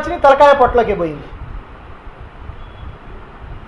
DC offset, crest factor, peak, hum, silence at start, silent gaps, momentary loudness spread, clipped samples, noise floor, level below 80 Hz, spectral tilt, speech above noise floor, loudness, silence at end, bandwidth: under 0.1%; 16 dB; 0 dBFS; none; 0 s; none; 26 LU; under 0.1%; -34 dBFS; -34 dBFS; -6 dB/octave; 22 dB; -12 LUFS; 0.05 s; 10.5 kHz